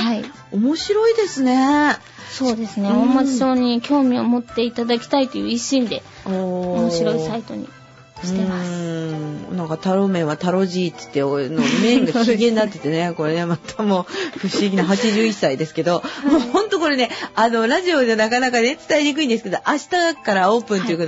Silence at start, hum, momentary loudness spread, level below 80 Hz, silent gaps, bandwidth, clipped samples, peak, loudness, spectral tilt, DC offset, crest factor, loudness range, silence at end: 0 s; none; 9 LU; -56 dBFS; none; 8 kHz; under 0.1%; -4 dBFS; -19 LUFS; -5 dB/octave; under 0.1%; 14 dB; 5 LU; 0 s